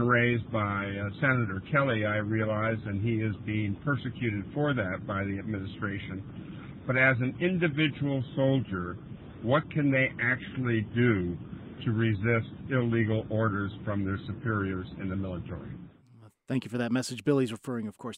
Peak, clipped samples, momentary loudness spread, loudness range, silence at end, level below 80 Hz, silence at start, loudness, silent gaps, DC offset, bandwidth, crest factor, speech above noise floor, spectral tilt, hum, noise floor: -10 dBFS; under 0.1%; 11 LU; 5 LU; 0 s; -56 dBFS; 0 s; -29 LUFS; none; under 0.1%; 11.5 kHz; 18 dB; 27 dB; -7 dB/octave; none; -56 dBFS